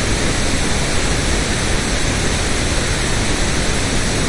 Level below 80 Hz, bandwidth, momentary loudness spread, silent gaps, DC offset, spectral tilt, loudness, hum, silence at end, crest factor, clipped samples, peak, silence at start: -22 dBFS; 11.5 kHz; 0 LU; none; under 0.1%; -3.5 dB/octave; -18 LUFS; none; 0 s; 12 dB; under 0.1%; -4 dBFS; 0 s